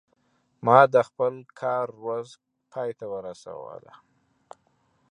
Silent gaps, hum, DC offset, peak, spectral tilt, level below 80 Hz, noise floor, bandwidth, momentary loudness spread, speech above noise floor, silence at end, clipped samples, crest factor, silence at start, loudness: none; none; under 0.1%; -2 dBFS; -6.5 dB/octave; -74 dBFS; -69 dBFS; 10 kHz; 23 LU; 44 dB; 1.35 s; under 0.1%; 24 dB; 0.65 s; -24 LUFS